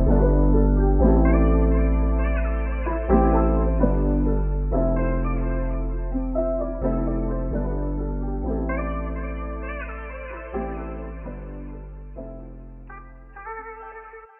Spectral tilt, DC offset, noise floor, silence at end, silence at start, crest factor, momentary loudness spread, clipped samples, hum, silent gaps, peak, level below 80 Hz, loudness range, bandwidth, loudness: -10 dB/octave; under 0.1%; -42 dBFS; 0.15 s; 0 s; 16 dB; 20 LU; under 0.1%; none; none; -6 dBFS; -24 dBFS; 15 LU; 3 kHz; -23 LUFS